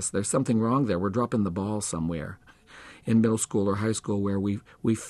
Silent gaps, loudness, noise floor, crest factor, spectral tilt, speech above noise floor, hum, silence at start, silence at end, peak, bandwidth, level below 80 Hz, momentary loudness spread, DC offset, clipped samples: none; -27 LUFS; -49 dBFS; 14 dB; -6 dB/octave; 23 dB; none; 0 s; 0 s; -12 dBFS; 12.5 kHz; -56 dBFS; 8 LU; under 0.1%; under 0.1%